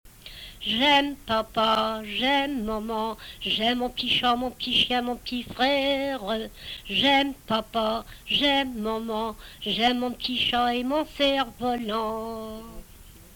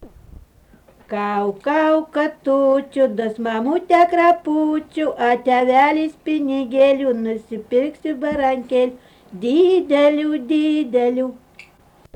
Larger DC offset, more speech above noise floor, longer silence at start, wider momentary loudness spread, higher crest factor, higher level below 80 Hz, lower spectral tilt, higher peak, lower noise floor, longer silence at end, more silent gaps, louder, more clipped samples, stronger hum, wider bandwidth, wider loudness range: neither; second, 22 dB vs 33 dB; about the same, 0.05 s vs 0 s; first, 12 LU vs 9 LU; about the same, 16 dB vs 14 dB; about the same, -50 dBFS vs -54 dBFS; second, -4 dB/octave vs -6 dB/octave; second, -10 dBFS vs -4 dBFS; about the same, -48 dBFS vs -51 dBFS; second, 0 s vs 0.8 s; neither; second, -25 LUFS vs -18 LUFS; neither; neither; first, over 20 kHz vs 9.6 kHz; about the same, 1 LU vs 3 LU